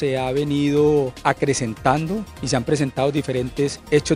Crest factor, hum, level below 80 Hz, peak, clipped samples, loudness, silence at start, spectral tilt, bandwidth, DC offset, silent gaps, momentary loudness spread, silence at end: 18 dB; none; -44 dBFS; -2 dBFS; under 0.1%; -21 LUFS; 0 s; -5.5 dB/octave; 15 kHz; under 0.1%; none; 6 LU; 0 s